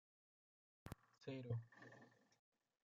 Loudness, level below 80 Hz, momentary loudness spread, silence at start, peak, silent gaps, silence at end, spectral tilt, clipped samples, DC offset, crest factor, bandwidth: -54 LUFS; -78 dBFS; 15 LU; 0.85 s; -36 dBFS; none; 0.75 s; -7 dB/octave; under 0.1%; under 0.1%; 22 dB; 7.4 kHz